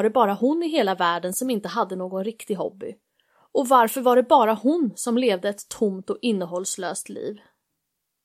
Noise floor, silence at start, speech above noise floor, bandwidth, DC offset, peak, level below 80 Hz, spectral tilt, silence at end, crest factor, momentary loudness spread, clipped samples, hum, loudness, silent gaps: -79 dBFS; 0 s; 57 dB; 16 kHz; under 0.1%; -4 dBFS; -74 dBFS; -4 dB/octave; 0.85 s; 20 dB; 12 LU; under 0.1%; none; -23 LUFS; none